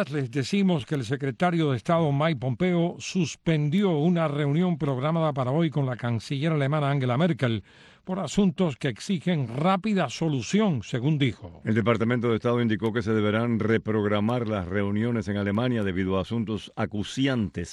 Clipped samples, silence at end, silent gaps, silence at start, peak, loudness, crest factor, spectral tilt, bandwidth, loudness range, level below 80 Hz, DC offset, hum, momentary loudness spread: under 0.1%; 0 s; none; 0 s; -8 dBFS; -26 LUFS; 16 dB; -7 dB/octave; 11 kHz; 2 LU; -56 dBFS; under 0.1%; none; 5 LU